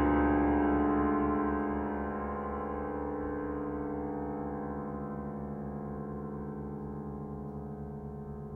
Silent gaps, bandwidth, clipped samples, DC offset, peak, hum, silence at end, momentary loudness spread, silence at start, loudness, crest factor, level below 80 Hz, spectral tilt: none; 3.1 kHz; under 0.1%; under 0.1%; -16 dBFS; none; 0 s; 13 LU; 0 s; -34 LUFS; 18 dB; -46 dBFS; -10.5 dB/octave